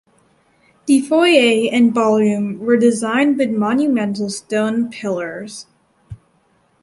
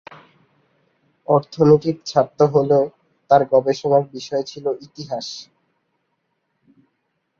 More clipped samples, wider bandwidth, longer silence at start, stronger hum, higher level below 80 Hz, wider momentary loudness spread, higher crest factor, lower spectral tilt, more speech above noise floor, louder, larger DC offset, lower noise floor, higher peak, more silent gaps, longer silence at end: neither; first, 11.5 kHz vs 7.2 kHz; second, 0.85 s vs 1.3 s; neither; about the same, -58 dBFS vs -60 dBFS; second, 11 LU vs 15 LU; about the same, 16 dB vs 18 dB; second, -5 dB/octave vs -7 dB/octave; second, 43 dB vs 54 dB; first, -16 LUFS vs -19 LUFS; neither; second, -59 dBFS vs -72 dBFS; about the same, 0 dBFS vs -2 dBFS; neither; second, 0.65 s vs 1.95 s